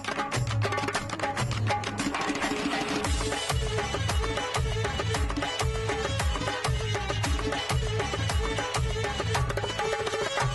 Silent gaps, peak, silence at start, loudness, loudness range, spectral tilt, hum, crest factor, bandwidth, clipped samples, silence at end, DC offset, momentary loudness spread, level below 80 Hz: none; -16 dBFS; 0 s; -29 LUFS; 0 LU; -4 dB/octave; none; 12 dB; 12.5 kHz; under 0.1%; 0 s; under 0.1%; 1 LU; -36 dBFS